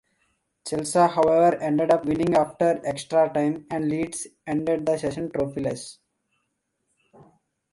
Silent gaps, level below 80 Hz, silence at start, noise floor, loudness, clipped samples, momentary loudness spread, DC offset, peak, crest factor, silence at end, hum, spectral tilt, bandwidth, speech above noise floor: none; -58 dBFS; 0.65 s; -76 dBFS; -23 LUFS; under 0.1%; 11 LU; under 0.1%; -6 dBFS; 18 dB; 1.8 s; none; -5.5 dB/octave; 11.5 kHz; 53 dB